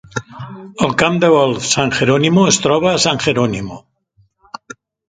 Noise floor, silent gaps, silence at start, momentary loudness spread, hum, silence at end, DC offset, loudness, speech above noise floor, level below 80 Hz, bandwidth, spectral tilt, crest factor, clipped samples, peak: -57 dBFS; none; 0.15 s; 21 LU; none; 1.3 s; under 0.1%; -14 LUFS; 43 dB; -48 dBFS; 9.6 kHz; -4 dB/octave; 16 dB; under 0.1%; 0 dBFS